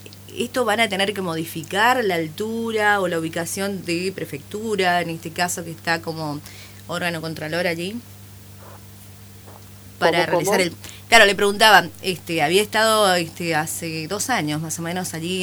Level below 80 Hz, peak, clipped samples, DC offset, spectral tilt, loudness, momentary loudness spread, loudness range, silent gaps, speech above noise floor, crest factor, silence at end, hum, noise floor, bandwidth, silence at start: -54 dBFS; 0 dBFS; under 0.1%; under 0.1%; -3 dB/octave; -20 LUFS; 15 LU; 10 LU; none; 21 dB; 22 dB; 0 s; 50 Hz at -45 dBFS; -42 dBFS; over 20 kHz; 0 s